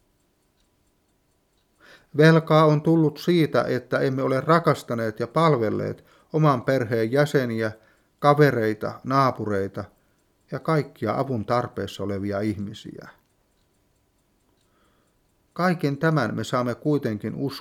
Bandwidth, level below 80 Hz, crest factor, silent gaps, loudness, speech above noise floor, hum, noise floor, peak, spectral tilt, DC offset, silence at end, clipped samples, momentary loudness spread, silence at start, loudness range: 15.5 kHz; -64 dBFS; 20 dB; none; -23 LUFS; 45 dB; none; -67 dBFS; -4 dBFS; -7.5 dB/octave; under 0.1%; 0 s; under 0.1%; 13 LU; 2.15 s; 10 LU